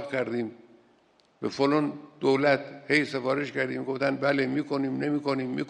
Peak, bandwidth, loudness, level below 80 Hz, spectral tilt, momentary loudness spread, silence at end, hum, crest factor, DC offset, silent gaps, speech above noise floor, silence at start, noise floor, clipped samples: -8 dBFS; 9.4 kHz; -27 LUFS; -72 dBFS; -6 dB/octave; 8 LU; 0 s; none; 20 dB; under 0.1%; none; 36 dB; 0 s; -63 dBFS; under 0.1%